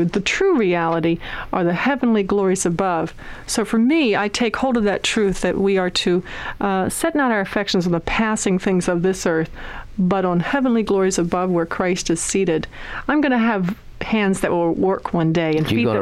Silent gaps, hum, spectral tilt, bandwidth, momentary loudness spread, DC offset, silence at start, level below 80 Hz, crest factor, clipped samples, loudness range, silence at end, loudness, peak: none; none; -5 dB/octave; 14.5 kHz; 6 LU; under 0.1%; 0 s; -40 dBFS; 12 dB; under 0.1%; 1 LU; 0 s; -19 LUFS; -6 dBFS